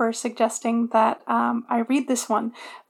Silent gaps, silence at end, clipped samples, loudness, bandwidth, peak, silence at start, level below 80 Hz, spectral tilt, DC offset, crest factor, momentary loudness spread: none; 0.1 s; under 0.1%; -23 LUFS; 15 kHz; -6 dBFS; 0 s; under -90 dBFS; -3.5 dB/octave; under 0.1%; 16 dB; 5 LU